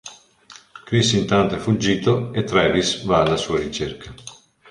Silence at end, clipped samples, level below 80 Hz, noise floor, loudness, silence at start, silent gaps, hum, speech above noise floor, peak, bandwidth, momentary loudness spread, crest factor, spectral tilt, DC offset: 0.4 s; under 0.1%; -44 dBFS; -47 dBFS; -20 LUFS; 0.05 s; none; none; 28 dB; 0 dBFS; 11.5 kHz; 20 LU; 20 dB; -5 dB/octave; under 0.1%